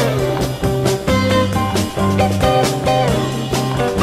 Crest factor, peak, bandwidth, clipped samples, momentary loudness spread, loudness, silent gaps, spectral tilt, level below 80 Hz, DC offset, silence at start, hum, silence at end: 14 dB; -2 dBFS; 15.5 kHz; under 0.1%; 4 LU; -17 LUFS; none; -5.5 dB/octave; -32 dBFS; under 0.1%; 0 s; none; 0 s